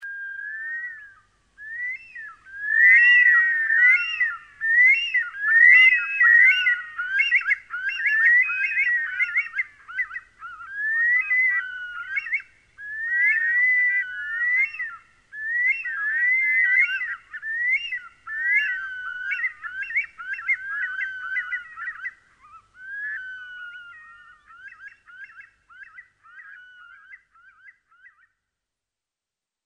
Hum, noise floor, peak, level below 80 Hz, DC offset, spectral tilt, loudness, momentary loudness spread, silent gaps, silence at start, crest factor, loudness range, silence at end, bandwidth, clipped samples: none; -89 dBFS; -6 dBFS; -70 dBFS; under 0.1%; 1 dB/octave; -19 LUFS; 20 LU; none; 0 s; 18 dB; 15 LU; 2.5 s; 8.6 kHz; under 0.1%